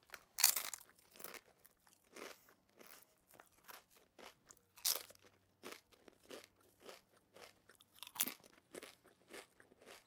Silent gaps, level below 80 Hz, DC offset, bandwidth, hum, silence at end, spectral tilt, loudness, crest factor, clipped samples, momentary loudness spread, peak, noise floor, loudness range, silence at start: none; -88 dBFS; under 0.1%; 18 kHz; none; 0.1 s; 1.5 dB/octave; -39 LUFS; 40 dB; under 0.1%; 25 LU; -10 dBFS; -71 dBFS; 18 LU; 0.1 s